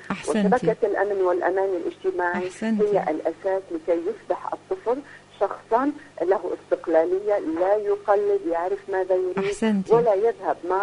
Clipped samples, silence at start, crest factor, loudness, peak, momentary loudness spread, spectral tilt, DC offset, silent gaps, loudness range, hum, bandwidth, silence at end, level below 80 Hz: under 0.1%; 0 s; 18 dB; -24 LUFS; -6 dBFS; 7 LU; -6.5 dB/octave; under 0.1%; none; 4 LU; 50 Hz at -55 dBFS; 10.5 kHz; 0 s; -60 dBFS